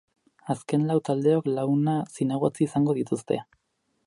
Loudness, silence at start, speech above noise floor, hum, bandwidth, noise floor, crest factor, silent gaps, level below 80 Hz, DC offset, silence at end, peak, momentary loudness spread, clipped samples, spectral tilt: -26 LUFS; 0.45 s; 50 dB; none; 11.5 kHz; -74 dBFS; 16 dB; none; -66 dBFS; under 0.1%; 0.65 s; -10 dBFS; 8 LU; under 0.1%; -8 dB/octave